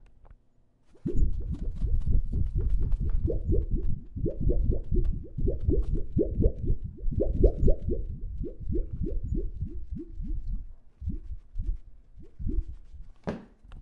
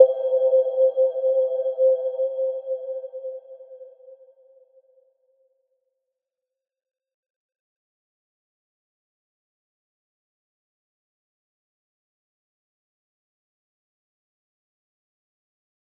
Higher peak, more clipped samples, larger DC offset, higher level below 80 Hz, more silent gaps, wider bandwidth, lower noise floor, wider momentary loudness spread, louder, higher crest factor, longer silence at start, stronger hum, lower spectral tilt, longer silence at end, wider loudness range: second, -8 dBFS vs -2 dBFS; neither; neither; first, -30 dBFS vs under -90 dBFS; neither; second, 2.1 kHz vs 3.5 kHz; second, -62 dBFS vs -86 dBFS; second, 12 LU vs 19 LU; second, -33 LUFS vs -22 LUFS; second, 20 dB vs 26 dB; about the same, 0 s vs 0 s; neither; first, -11.5 dB/octave vs -1.5 dB/octave; second, 0 s vs 11.85 s; second, 10 LU vs 20 LU